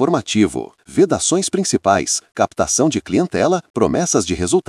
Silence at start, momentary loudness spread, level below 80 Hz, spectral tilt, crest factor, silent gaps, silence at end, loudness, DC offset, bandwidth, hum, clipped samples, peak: 0 s; 4 LU; -48 dBFS; -4 dB/octave; 16 dB; 3.70-3.74 s; 0.05 s; -17 LUFS; under 0.1%; 12 kHz; none; under 0.1%; 0 dBFS